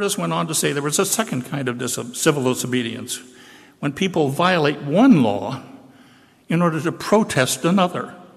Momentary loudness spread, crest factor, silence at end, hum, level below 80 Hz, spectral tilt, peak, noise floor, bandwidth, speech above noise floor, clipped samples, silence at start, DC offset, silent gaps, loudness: 11 LU; 16 dB; 0.1 s; none; -60 dBFS; -4.5 dB/octave; -4 dBFS; -51 dBFS; 14.5 kHz; 31 dB; under 0.1%; 0 s; under 0.1%; none; -20 LUFS